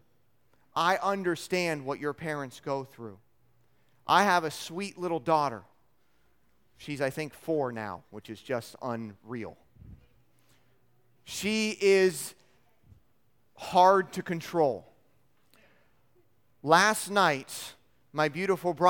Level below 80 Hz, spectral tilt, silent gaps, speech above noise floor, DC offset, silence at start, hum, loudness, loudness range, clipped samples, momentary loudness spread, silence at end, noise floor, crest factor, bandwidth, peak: -68 dBFS; -4 dB/octave; none; 44 dB; under 0.1%; 0.75 s; none; -28 LUFS; 9 LU; under 0.1%; 18 LU; 0 s; -72 dBFS; 24 dB; 18 kHz; -6 dBFS